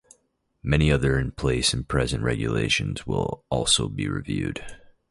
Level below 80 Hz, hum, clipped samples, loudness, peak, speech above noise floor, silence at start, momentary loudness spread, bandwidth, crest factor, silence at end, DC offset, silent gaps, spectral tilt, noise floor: -36 dBFS; none; under 0.1%; -24 LUFS; -6 dBFS; 45 dB; 0.65 s; 8 LU; 11.5 kHz; 18 dB; 0.35 s; under 0.1%; none; -4.5 dB/octave; -69 dBFS